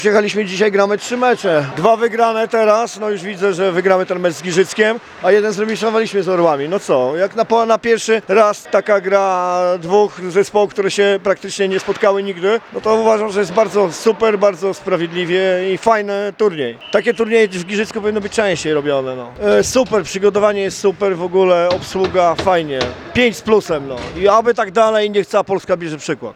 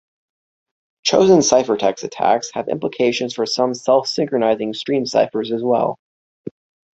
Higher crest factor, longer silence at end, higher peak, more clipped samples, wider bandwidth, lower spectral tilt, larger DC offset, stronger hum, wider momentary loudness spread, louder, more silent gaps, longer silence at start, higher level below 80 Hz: about the same, 14 dB vs 18 dB; second, 0.05 s vs 0.45 s; about the same, 0 dBFS vs 0 dBFS; neither; first, 13.5 kHz vs 8.2 kHz; about the same, -4.5 dB/octave vs -4 dB/octave; neither; neither; second, 5 LU vs 11 LU; first, -15 LUFS vs -18 LUFS; second, none vs 5.99-6.44 s; second, 0 s vs 1.05 s; first, -50 dBFS vs -60 dBFS